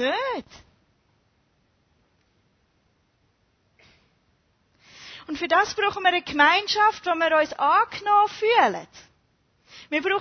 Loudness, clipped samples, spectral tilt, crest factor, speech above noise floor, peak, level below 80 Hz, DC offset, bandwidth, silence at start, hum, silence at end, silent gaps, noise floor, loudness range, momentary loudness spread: -21 LUFS; under 0.1%; -2.5 dB/octave; 22 dB; 45 dB; -4 dBFS; -64 dBFS; under 0.1%; 6.6 kHz; 0 s; none; 0 s; none; -67 dBFS; 13 LU; 16 LU